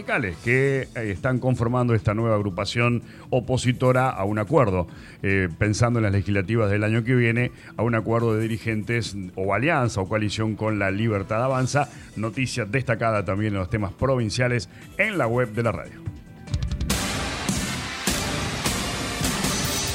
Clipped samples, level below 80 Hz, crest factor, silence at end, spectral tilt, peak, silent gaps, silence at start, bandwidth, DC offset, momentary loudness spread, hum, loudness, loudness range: under 0.1%; -42 dBFS; 16 dB; 0 s; -5.5 dB/octave; -6 dBFS; none; 0 s; 16 kHz; under 0.1%; 7 LU; none; -24 LUFS; 3 LU